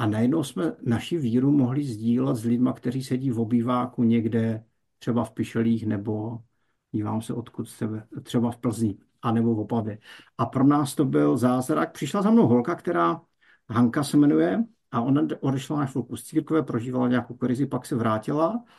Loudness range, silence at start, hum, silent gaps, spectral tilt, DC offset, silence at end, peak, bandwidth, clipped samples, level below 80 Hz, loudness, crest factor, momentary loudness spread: 6 LU; 0 s; none; none; -7.5 dB/octave; under 0.1%; 0.15 s; -8 dBFS; 12.5 kHz; under 0.1%; -64 dBFS; -25 LUFS; 16 dB; 11 LU